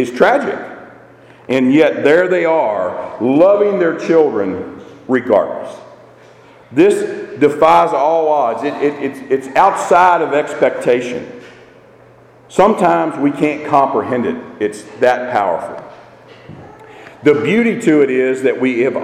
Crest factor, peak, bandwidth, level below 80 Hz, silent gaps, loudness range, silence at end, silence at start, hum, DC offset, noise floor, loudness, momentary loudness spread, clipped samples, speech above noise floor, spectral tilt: 14 dB; 0 dBFS; 13.5 kHz; -56 dBFS; none; 4 LU; 0 s; 0 s; none; under 0.1%; -44 dBFS; -14 LUFS; 12 LU; under 0.1%; 30 dB; -6 dB/octave